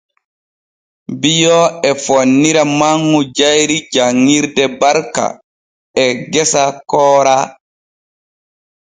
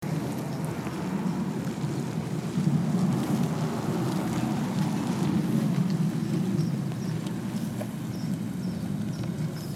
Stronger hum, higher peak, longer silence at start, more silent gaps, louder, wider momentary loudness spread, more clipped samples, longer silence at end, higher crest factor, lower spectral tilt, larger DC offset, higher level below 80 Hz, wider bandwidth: neither; first, 0 dBFS vs -14 dBFS; first, 1.1 s vs 0 s; first, 5.44-5.94 s vs none; first, -12 LUFS vs -29 LUFS; about the same, 7 LU vs 6 LU; neither; first, 1.3 s vs 0 s; about the same, 14 dB vs 14 dB; second, -3.5 dB/octave vs -7 dB/octave; neither; about the same, -56 dBFS vs -58 dBFS; second, 9.8 kHz vs 16 kHz